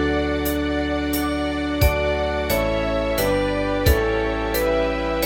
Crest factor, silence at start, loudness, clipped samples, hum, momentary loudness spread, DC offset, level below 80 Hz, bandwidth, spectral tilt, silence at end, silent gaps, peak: 16 dB; 0 s; -21 LUFS; under 0.1%; none; 3 LU; under 0.1%; -28 dBFS; 17 kHz; -5.5 dB/octave; 0 s; none; -4 dBFS